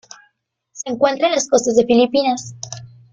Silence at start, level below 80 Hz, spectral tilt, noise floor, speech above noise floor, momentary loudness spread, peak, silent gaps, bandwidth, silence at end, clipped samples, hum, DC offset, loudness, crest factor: 0.75 s; -58 dBFS; -3.5 dB/octave; -66 dBFS; 50 dB; 17 LU; -2 dBFS; none; 9.4 kHz; 0.25 s; under 0.1%; none; under 0.1%; -16 LUFS; 16 dB